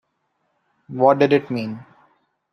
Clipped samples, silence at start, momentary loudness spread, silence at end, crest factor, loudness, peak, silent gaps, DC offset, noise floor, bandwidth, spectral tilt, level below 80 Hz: under 0.1%; 0.9 s; 19 LU; 0.7 s; 20 dB; -19 LUFS; -2 dBFS; none; under 0.1%; -71 dBFS; 6.4 kHz; -8 dB/octave; -66 dBFS